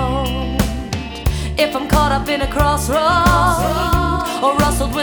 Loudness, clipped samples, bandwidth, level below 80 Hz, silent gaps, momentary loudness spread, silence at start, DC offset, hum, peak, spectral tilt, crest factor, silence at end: -17 LUFS; under 0.1%; over 20 kHz; -24 dBFS; none; 8 LU; 0 s; under 0.1%; none; -2 dBFS; -5 dB/octave; 16 dB; 0 s